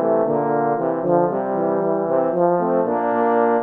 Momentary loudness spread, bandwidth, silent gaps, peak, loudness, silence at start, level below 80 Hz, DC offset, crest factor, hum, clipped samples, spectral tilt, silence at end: 3 LU; 3.7 kHz; none; -4 dBFS; -19 LUFS; 0 s; -68 dBFS; under 0.1%; 14 dB; none; under 0.1%; -11 dB/octave; 0 s